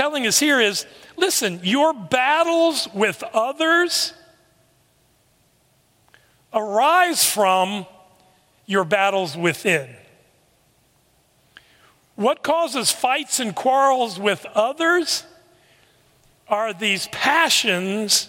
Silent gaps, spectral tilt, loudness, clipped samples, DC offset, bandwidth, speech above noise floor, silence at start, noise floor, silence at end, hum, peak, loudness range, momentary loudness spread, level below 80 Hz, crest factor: none; -2 dB/octave; -19 LUFS; under 0.1%; under 0.1%; 16.5 kHz; 41 dB; 0 s; -61 dBFS; 0 s; none; -2 dBFS; 6 LU; 8 LU; -70 dBFS; 20 dB